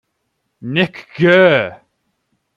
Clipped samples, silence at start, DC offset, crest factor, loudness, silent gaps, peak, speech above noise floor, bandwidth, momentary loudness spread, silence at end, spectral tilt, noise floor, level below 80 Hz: under 0.1%; 0.65 s; under 0.1%; 16 dB; -14 LUFS; none; 0 dBFS; 57 dB; 7.2 kHz; 14 LU; 0.8 s; -7.5 dB/octave; -70 dBFS; -58 dBFS